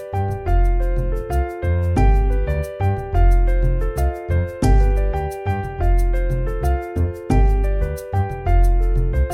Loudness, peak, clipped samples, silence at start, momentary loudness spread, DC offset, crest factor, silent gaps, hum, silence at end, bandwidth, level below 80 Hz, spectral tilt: -21 LUFS; -4 dBFS; under 0.1%; 0 s; 6 LU; under 0.1%; 12 dB; none; none; 0 s; 11.5 kHz; -18 dBFS; -8 dB/octave